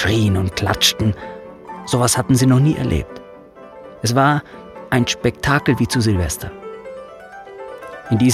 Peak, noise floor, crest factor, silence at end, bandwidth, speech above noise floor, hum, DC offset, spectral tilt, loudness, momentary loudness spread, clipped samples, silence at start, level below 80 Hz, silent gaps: 0 dBFS; -40 dBFS; 18 dB; 0 s; 15 kHz; 23 dB; none; under 0.1%; -5 dB/octave; -17 LUFS; 21 LU; under 0.1%; 0 s; -38 dBFS; none